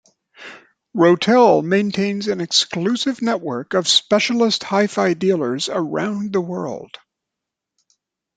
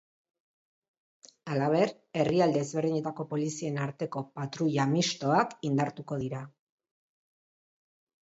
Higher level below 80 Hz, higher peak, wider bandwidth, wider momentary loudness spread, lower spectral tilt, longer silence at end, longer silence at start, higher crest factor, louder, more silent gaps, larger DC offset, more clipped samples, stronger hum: first, -64 dBFS vs -70 dBFS; first, -2 dBFS vs -12 dBFS; first, 9.4 kHz vs 8 kHz; first, 14 LU vs 10 LU; second, -4 dB/octave vs -5.5 dB/octave; second, 1.5 s vs 1.8 s; second, 0.4 s vs 1.45 s; about the same, 18 dB vs 20 dB; first, -18 LUFS vs -30 LUFS; neither; neither; neither; neither